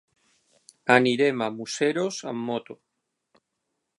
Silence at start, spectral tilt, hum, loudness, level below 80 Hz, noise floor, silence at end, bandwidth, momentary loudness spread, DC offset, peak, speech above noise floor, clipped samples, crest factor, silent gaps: 0.85 s; -4.5 dB/octave; none; -24 LUFS; -78 dBFS; -80 dBFS; 1.25 s; 11.5 kHz; 12 LU; under 0.1%; -2 dBFS; 56 dB; under 0.1%; 26 dB; none